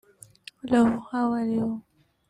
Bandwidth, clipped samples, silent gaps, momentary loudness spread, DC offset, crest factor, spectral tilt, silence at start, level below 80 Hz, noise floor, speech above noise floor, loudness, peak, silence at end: 11 kHz; under 0.1%; none; 21 LU; under 0.1%; 18 dB; -6.5 dB/octave; 0.65 s; -60 dBFS; -49 dBFS; 26 dB; -25 LUFS; -10 dBFS; 0.5 s